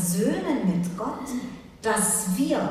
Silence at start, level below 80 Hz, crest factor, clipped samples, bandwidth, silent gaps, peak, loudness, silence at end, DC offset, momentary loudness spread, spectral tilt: 0 s; -54 dBFS; 14 dB; under 0.1%; 15.5 kHz; none; -10 dBFS; -25 LUFS; 0 s; under 0.1%; 11 LU; -4.5 dB/octave